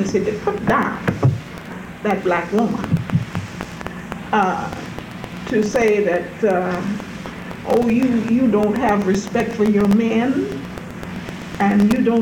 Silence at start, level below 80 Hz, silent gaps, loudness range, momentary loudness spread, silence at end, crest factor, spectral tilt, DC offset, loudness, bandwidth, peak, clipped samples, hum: 0 s; -46 dBFS; none; 4 LU; 15 LU; 0 s; 14 dB; -7 dB/octave; under 0.1%; -19 LUFS; 17 kHz; -4 dBFS; under 0.1%; none